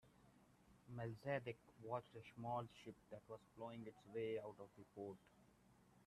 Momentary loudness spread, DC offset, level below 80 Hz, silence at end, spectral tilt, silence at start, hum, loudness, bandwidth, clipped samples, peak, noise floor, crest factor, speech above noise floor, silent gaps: 13 LU; under 0.1%; -82 dBFS; 0 s; -7 dB/octave; 0.05 s; none; -52 LUFS; 13 kHz; under 0.1%; -30 dBFS; -73 dBFS; 22 dB; 21 dB; none